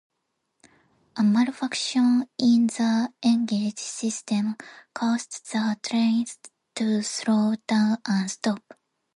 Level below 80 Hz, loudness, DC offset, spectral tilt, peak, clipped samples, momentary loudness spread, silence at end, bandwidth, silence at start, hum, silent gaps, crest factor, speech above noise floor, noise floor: -74 dBFS; -24 LUFS; under 0.1%; -4.5 dB/octave; -8 dBFS; under 0.1%; 9 LU; 0.6 s; 11 kHz; 1.15 s; none; none; 16 dB; 54 dB; -78 dBFS